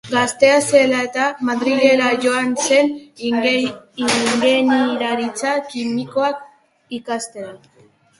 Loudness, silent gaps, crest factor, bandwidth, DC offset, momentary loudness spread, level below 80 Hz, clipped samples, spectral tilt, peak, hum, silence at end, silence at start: -17 LUFS; none; 18 dB; 11.5 kHz; under 0.1%; 12 LU; -62 dBFS; under 0.1%; -3 dB/octave; 0 dBFS; none; 0.65 s; 0.05 s